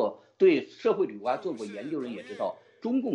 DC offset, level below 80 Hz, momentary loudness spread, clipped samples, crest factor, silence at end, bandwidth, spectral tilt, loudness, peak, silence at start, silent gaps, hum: under 0.1%; -82 dBFS; 13 LU; under 0.1%; 16 dB; 0 s; 8.8 kHz; -6.5 dB/octave; -29 LUFS; -12 dBFS; 0 s; none; none